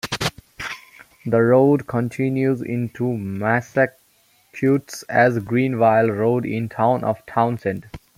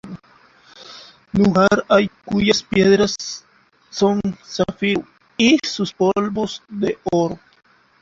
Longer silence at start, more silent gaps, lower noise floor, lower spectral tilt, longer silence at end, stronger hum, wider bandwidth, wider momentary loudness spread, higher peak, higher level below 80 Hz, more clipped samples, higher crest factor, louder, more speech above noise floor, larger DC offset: about the same, 0.05 s vs 0.05 s; neither; first, -59 dBFS vs -52 dBFS; first, -6.5 dB/octave vs -5 dB/octave; second, 0.2 s vs 0.65 s; neither; first, 16 kHz vs 7.6 kHz; second, 14 LU vs 19 LU; about the same, -2 dBFS vs -2 dBFS; about the same, -54 dBFS vs -50 dBFS; neither; about the same, 18 dB vs 18 dB; about the same, -20 LUFS vs -18 LUFS; first, 40 dB vs 34 dB; neither